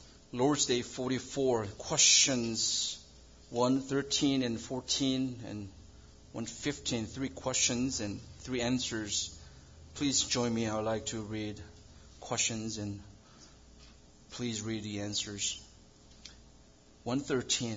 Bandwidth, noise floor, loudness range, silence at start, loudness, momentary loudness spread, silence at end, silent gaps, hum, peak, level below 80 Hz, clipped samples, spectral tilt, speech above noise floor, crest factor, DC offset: 7.8 kHz; -59 dBFS; 10 LU; 0 s; -32 LUFS; 16 LU; 0 s; none; none; -12 dBFS; -60 dBFS; under 0.1%; -2.5 dB/octave; 26 dB; 22 dB; under 0.1%